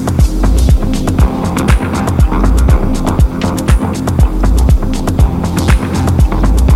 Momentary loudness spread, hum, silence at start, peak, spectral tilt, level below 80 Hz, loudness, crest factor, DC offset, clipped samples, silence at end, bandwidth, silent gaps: 3 LU; none; 0 s; 0 dBFS; -6.5 dB/octave; -12 dBFS; -12 LUFS; 10 dB; under 0.1%; under 0.1%; 0 s; 14.5 kHz; none